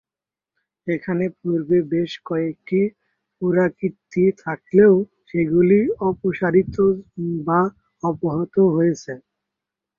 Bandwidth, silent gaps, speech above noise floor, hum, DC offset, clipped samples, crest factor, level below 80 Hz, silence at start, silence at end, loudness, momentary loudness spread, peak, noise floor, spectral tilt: 7.2 kHz; none; 71 dB; none; under 0.1%; under 0.1%; 18 dB; -54 dBFS; 0.85 s; 0.8 s; -20 LUFS; 11 LU; -4 dBFS; -90 dBFS; -8.5 dB/octave